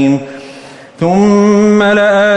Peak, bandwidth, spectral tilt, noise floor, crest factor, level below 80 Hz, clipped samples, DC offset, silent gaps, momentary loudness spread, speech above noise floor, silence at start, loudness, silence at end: 0 dBFS; 8.6 kHz; -6.5 dB/octave; -33 dBFS; 10 dB; -46 dBFS; under 0.1%; under 0.1%; none; 20 LU; 24 dB; 0 s; -9 LUFS; 0 s